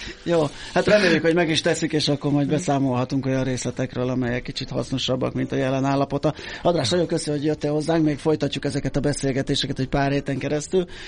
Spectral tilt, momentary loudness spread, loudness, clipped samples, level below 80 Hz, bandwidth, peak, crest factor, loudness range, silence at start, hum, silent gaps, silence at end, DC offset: -5.5 dB/octave; 6 LU; -22 LUFS; under 0.1%; -42 dBFS; 10.5 kHz; -4 dBFS; 18 dB; 4 LU; 0 s; none; none; 0 s; under 0.1%